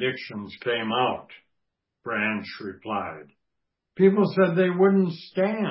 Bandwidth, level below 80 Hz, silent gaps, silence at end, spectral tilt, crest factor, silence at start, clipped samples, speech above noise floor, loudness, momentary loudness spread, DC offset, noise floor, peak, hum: 5.8 kHz; -66 dBFS; none; 0 s; -11 dB/octave; 18 dB; 0 s; under 0.1%; 57 dB; -24 LUFS; 16 LU; under 0.1%; -81 dBFS; -6 dBFS; none